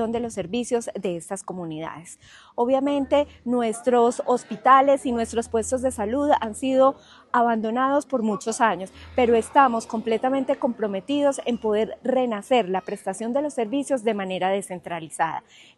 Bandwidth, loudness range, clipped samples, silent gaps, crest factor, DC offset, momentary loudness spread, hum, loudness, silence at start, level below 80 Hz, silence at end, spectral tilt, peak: 12.5 kHz; 4 LU; under 0.1%; none; 20 dB; under 0.1%; 12 LU; none; -23 LUFS; 0 s; -56 dBFS; 0.4 s; -4.5 dB/octave; -4 dBFS